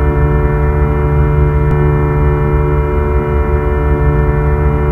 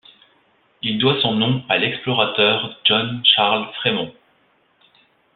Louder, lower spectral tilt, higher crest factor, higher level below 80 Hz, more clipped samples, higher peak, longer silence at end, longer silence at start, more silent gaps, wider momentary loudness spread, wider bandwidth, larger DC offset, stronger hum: first, -13 LUFS vs -17 LUFS; first, -10.5 dB/octave vs -8 dB/octave; second, 10 dB vs 20 dB; first, -14 dBFS vs -60 dBFS; neither; about the same, 0 dBFS vs -2 dBFS; second, 0 s vs 1.25 s; second, 0 s vs 0.85 s; neither; second, 2 LU vs 8 LU; second, 3.4 kHz vs 4.6 kHz; neither; neither